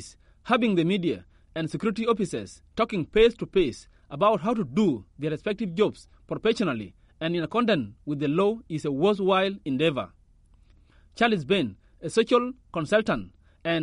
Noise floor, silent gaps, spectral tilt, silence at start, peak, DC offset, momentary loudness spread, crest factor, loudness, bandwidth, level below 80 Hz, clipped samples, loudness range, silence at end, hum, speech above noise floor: -57 dBFS; none; -6 dB/octave; 0 s; -8 dBFS; under 0.1%; 12 LU; 18 dB; -26 LUFS; 11 kHz; -52 dBFS; under 0.1%; 2 LU; 0 s; none; 32 dB